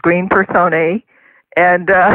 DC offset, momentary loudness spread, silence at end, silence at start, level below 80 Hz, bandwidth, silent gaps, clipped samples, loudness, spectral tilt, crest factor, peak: under 0.1%; 8 LU; 0 s; 0.05 s; -48 dBFS; 4.1 kHz; none; under 0.1%; -13 LUFS; -9 dB/octave; 12 dB; 0 dBFS